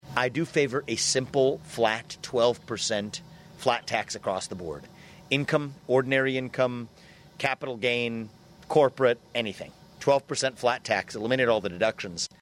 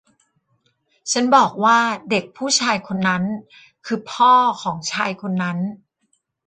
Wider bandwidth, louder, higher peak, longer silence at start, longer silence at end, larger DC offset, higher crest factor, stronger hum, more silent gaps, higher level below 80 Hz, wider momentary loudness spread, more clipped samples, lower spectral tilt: first, 15.5 kHz vs 9.4 kHz; second, -27 LUFS vs -19 LUFS; second, -6 dBFS vs -2 dBFS; second, 0.05 s vs 1.05 s; second, 0.15 s vs 0.7 s; neither; about the same, 20 dB vs 18 dB; neither; neither; about the same, -62 dBFS vs -64 dBFS; about the same, 11 LU vs 13 LU; neither; about the same, -3.5 dB/octave vs -3.5 dB/octave